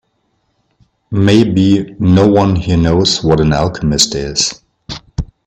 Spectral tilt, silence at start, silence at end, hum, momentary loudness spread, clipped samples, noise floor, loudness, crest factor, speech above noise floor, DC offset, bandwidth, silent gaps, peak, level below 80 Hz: -5 dB/octave; 1.1 s; 0.2 s; none; 15 LU; under 0.1%; -63 dBFS; -12 LUFS; 12 dB; 52 dB; under 0.1%; 14 kHz; none; 0 dBFS; -32 dBFS